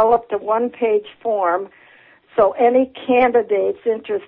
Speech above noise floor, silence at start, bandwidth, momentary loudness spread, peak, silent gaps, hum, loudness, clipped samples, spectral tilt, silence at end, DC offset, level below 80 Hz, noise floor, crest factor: 32 dB; 0 s; 4 kHz; 8 LU; -4 dBFS; none; none; -18 LUFS; under 0.1%; -9 dB/octave; 0.05 s; under 0.1%; -58 dBFS; -49 dBFS; 14 dB